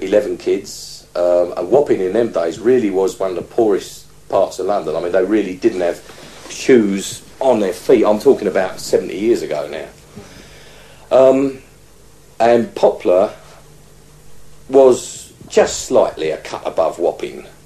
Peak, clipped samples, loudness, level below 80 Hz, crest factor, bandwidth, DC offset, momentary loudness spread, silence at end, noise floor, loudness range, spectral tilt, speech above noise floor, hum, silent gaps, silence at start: 0 dBFS; under 0.1%; -16 LUFS; -50 dBFS; 16 dB; 13 kHz; 0.4%; 15 LU; 0.15 s; -46 dBFS; 3 LU; -5 dB/octave; 31 dB; none; none; 0 s